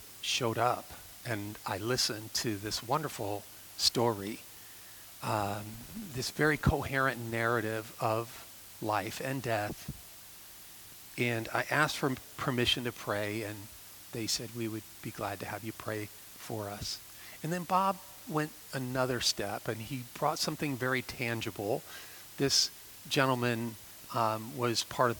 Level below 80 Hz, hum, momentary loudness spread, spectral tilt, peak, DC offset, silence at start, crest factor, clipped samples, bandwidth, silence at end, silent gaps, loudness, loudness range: -56 dBFS; none; 16 LU; -3.5 dB/octave; -10 dBFS; under 0.1%; 0 s; 24 dB; under 0.1%; 19.5 kHz; 0 s; none; -33 LUFS; 5 LU